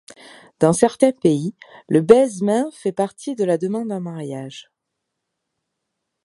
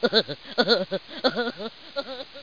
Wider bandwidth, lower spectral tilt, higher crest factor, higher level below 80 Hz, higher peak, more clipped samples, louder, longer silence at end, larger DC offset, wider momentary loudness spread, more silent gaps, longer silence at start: first, 11.5 kHz vs 5.2 kHz; first, -6 dB/octave vs -4.5 dB/octave; about the same, 20 dB vs 22 dB; about the same, -60 dBFS vs -64 dBFS; first, 0 dBFS vs -4 dBFS; neither; first, -19 LUFS vs -25 LUFS; first, 1.65 s vs 0 s; second, under 0.1% vs 0.3%; first, 16 LU vs 13 LU; neither; first, 0.6 s vs 0 s